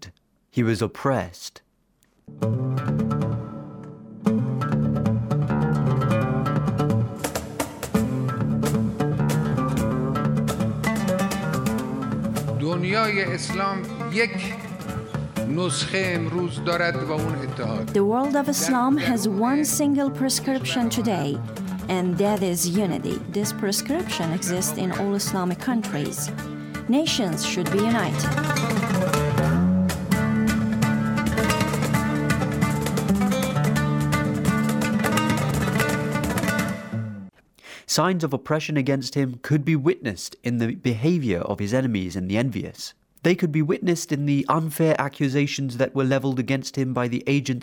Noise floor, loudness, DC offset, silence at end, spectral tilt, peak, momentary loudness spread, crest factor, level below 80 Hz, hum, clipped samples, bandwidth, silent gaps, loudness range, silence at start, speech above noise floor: -65 dBFS; -24 LUFS; under 0.1%; 0 s; -5.5 dB/octave; -4 dBFS; 7 LU; 18 dB; -48 dBFS; none; under 0.1%; 19.5 kHz; none; 3 LU; 0 s; 41 dB